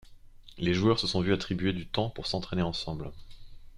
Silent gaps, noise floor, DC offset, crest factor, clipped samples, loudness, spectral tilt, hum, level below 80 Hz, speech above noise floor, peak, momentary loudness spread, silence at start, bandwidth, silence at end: none; -50 dBFS; under 0.1%; 20 dB; under 0.1%; -30 LUFS; -6 dB/octave; none; -48 dBFS; 21 dB; -10 dBFS; 10 LU; 0.05 s; 11.5 kHz; 0 s